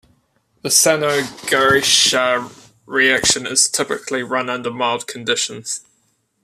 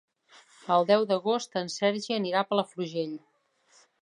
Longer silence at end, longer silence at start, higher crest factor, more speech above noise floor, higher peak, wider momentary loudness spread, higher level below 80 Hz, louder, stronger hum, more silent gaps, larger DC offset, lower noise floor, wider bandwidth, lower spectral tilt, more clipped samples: second, 0.65 s vs 0.85 s; about the same, 0.65 s vs 0.65 s; about the same, 18 dB vs 20 dB; first, 46 dB vs 37 dB; first, 0 dBFS vs -8 dBFS; about the same, 11 LU vs 11 LU; first, -54 dBFS vs -82 dBFS; first, -16 LUFS vs -28 LUFS; neither; neither; neither; about the same, -64 dBFS vs -64 dBFS; first, 14.5 kHz vs 11 kHz; second, -1 dB/octave vs -4.5 dB/octave; neither